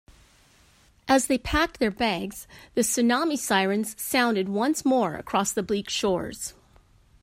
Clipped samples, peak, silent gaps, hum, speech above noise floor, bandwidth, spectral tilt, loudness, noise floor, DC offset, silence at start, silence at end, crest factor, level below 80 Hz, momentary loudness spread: under 0.1%; -6 dBFS; none; none; 34 dB; 16 kHz; -3.5 dB/octave; -25 LUFS; -59 dBFS; under 0.1%; 1.05 s; 0.7 s; 20 dB; -48 dBFS; 10 LU